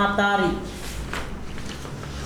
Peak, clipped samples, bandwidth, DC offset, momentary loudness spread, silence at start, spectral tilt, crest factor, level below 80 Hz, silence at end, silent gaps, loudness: -8 dBFS; under 0.1%; 19.5 kHz; under 0.1%; 15 LU; 0 s; -5 dB/octave; 18 dB; -38 dBFS; 0 s; none; -27 LUFS